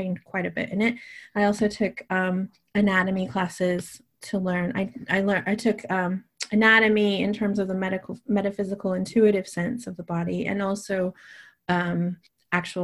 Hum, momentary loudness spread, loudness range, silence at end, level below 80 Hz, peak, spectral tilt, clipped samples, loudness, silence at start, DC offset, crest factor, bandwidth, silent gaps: none; 10 LU; 4 LU; 0 s; -60 dBFS; -4 dBFS; -6 dB/octave; under 0.1%; -25 LUFS; 0 s; under 0.1%; 20 dB; 12.5 kHz; none